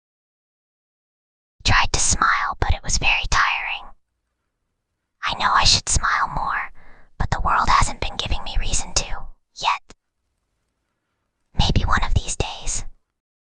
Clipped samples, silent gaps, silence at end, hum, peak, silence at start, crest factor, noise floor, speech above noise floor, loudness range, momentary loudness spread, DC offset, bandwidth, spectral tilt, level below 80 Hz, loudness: under 0.1%; none; 0.6 s; none; -2 dBFS; 1.65 s; 20 dB; -76 dBFS; 57 dB; 7 LU; 11 LU; under 0.1%; 10 kHz; -2 dB/octave; -28 dBFS; -21 LUFS